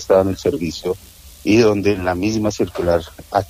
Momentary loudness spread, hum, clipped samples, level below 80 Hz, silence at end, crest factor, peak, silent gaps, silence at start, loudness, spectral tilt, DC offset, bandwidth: 11 LU; none; under 0.1%; -42 dBFS; 0.05 s; 16 dB; -2 dBFS; none; 0 s; -18 LUFS; -6 dB/octave; under 0.1%; 15.5 kHz